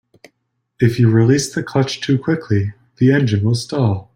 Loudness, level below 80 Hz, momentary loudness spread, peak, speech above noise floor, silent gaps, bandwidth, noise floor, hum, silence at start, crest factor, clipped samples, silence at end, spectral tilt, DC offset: -17 LUFS; -52 dBFS; 6 LU; -2 dBFS; 55 dB; none; 14.5 kHz; -70 dBFS; none; 0.8 s; 14 dB; under 0.1%; 0.1 s; -6.5 dB/octave; under 0.1%